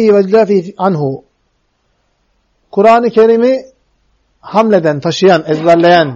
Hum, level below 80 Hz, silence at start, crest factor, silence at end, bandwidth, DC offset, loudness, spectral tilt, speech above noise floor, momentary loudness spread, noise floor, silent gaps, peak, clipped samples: none; -56 dBFS; 0 s; 12 dB; 0 s; 7.8 kHz; under 0.1%; -10 LUFS; -6.5 dB/octave; 52 dB; 9 LU; -61 dBFS; none; 0 dBFS; under 0.1%